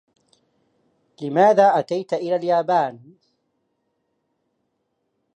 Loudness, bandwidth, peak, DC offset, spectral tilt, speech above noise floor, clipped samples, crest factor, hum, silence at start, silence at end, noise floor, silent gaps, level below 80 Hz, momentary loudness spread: -19 LUFS; 9.2 kHz; -2 dBFS; under 0.1%; -6.5 dB/octave; 55 dB; under 0.1%; 20 dB; none; 1.2 s; 2.4 s; -73 dBFS; none; -78 dBFS; 11 LU